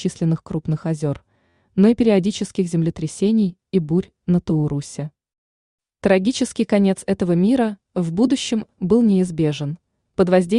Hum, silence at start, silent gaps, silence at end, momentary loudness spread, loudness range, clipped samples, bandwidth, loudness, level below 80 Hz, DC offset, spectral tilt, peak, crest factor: none; 0 s; 5.38-5.78 s; 0 s; 10 LU; 3 LU; under 0.1%; 11 kHz; -20 LUFS; -50 dBFS; under 0.1%; -7 dB/octave; -4 dBFS; 16 dB